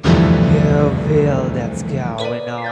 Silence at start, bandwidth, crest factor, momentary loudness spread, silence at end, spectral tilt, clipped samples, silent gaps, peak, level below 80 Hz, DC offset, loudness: 0 s; 9.2 kHz; 14 dB; 10 LU; 0 s; -7.5 dB/octave; under 0.1%; none; 0 dBFS; -30 dBFS; under 0.1%; -16 LUFS